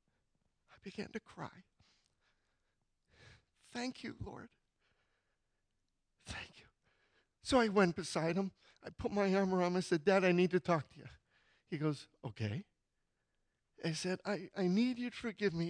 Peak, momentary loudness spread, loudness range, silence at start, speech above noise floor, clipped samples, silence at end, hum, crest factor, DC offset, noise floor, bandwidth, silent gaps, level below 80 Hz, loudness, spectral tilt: -18 dBFS; 19 LU; 19 LU; 0.85 s; 48 dB; under 0.1%; 0 s; none; 20 dB; under 0.1%; -84 dBFS; 10.5 kHz; none; -66 dBFS; -36 LUFS; -6 dB/octave